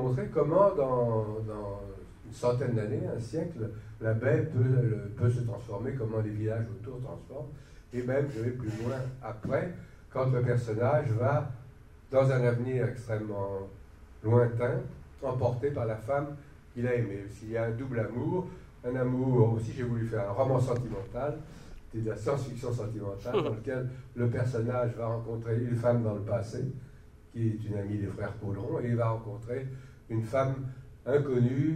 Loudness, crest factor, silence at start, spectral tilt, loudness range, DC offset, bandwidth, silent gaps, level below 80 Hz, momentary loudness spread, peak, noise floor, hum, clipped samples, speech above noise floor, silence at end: -31 LUFS; 20 dB; 0 s; -8.5 dB/octave; 4 LU; under 0.1%; 9.6 kHz; none; -54 dBFS; 13 LU; -12 dBFS; -52 dBFS; none; under 0.1%; 22 dB; 0 s